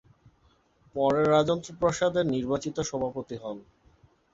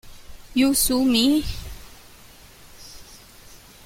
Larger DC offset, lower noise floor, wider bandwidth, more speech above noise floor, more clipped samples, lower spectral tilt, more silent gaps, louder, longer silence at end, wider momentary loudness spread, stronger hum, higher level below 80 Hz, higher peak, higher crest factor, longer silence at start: neither; first, -65 dBFS vs -47 dBFS; second, 8 kHz vs 16.5 kHz; first, 38 dB vs 28 dB; neither; first, -5.5 dB/octave vs -3 dB/octave; neither; second, -27 LUFS vs -20 LUFS; first, 0.7 s vs 0.3 s; second, 15 LU vs 25 LU; neither; second, -58 dBFS vs -40 dBFS; second, -10 dBFS vs -6 dBFS; about the same, 18 dB vs 18 dB; first, 0.95 s vs 0.05 s